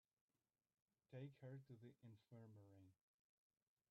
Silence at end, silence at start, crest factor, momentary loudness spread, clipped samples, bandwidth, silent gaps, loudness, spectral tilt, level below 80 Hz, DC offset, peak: 0.95 s; 1.1 s; 18 dB; 9 LU; under 0.1%; 5.2 kHz; none; -63 LUFS; -8 dB/octave; under -90 dBFS; under 0.1%; -46 dBFS